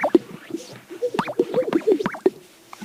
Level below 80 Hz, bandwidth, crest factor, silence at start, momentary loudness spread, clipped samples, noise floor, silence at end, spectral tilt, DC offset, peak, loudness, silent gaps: -66 dBFS; 16 kHz; 22 dB; 0 s; 14 LU; under 0.1%; -45 dBFS; 0 s; -6 dB/octave; under 0.1%; -2 dBFS; -23 LUFS; none